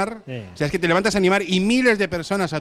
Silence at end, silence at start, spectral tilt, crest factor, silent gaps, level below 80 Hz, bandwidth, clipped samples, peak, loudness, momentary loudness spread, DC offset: 0 s; 0 s; -5 dB/octave; 16 dB; none; -48 dBFS; 13.5 kHz; under 0.1%; -4 dBFS; -20 LUFS; 9 LU; under 0.1%